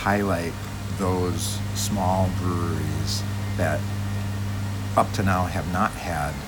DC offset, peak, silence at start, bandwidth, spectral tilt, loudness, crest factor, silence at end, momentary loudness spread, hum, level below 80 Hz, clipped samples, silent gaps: under 0.1%; -6 dBFS; 0 s; 19.5 kHz; -5.5 dB/octave; -25 LUFS; 20 dB; 0 s; 6 LU; none; -40 dBFS; under 0.1%; none